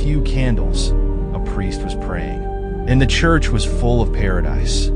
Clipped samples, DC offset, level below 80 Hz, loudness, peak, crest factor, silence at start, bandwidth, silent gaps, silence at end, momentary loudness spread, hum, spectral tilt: under 0.1%; under 0.1%; -18 dBFS; -19 LUFS; -2 dBFS; 14 dB; 0 s; 10.5 kHz; none; 0 s; 9 LU; none; -5.5 dB/octave